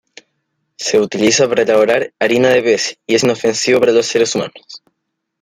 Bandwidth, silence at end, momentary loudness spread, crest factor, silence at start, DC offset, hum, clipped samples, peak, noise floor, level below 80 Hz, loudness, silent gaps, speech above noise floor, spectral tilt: 15.5 kHz; 0.65 s; 5 LU; 14 dB; 0.8 s; under 0.1%; none; under 0.1%; 0 dBFS; -73 dBFS; -58 dBFS; -14 LUFS; none; 60 dB; -3 dB/octave